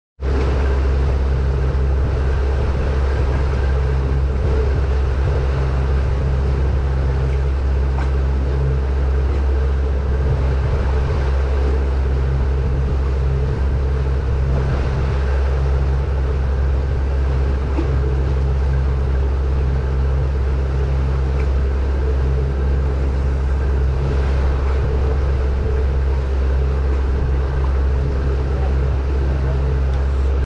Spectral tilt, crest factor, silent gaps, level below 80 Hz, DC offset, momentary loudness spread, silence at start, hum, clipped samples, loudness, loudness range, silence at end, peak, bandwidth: -8.5 dB/octave; 10 dB; none; -18 dBFS; under 0.1%; 1 LU; 0.2 s; none; under 0.1%; -19 LUFS; 0 LU; 0 s; -8 dBFS; 6.2 kHz